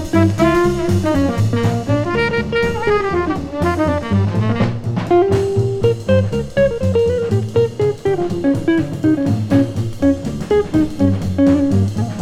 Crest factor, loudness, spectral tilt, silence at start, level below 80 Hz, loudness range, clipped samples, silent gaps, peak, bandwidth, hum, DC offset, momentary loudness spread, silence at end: 14 dB; -17 LUFS; -7.5 dB/octave; 0 s; -36 dBFS; 1 LU; under 0.1%; none; 0 dBFS; 13.5 kHz; none; under 0.1%; 5 LU; 0 s